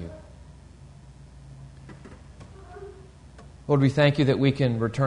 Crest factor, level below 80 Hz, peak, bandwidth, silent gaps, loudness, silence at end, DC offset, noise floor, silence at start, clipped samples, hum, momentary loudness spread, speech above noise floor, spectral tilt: 18 dB; -50 dBFS; -8 dBFS; 10 kHz; none; -22 LUFS; 0 s; under 0.1%; -47 dBFS; 0 s; under 0.1%; none; 26 LU; 26 dB; -7.5 dB/octave